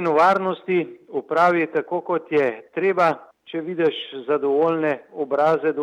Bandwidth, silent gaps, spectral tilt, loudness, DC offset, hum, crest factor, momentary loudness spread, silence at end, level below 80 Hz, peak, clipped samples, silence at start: 9.6 kHz; none; -6.5 dB/octave; -21 LUFS; under 0.1%; none; 16 dB; 11 LU; 0 s; -80 dBFS; -6 dBFS; under 0.1%; 0 s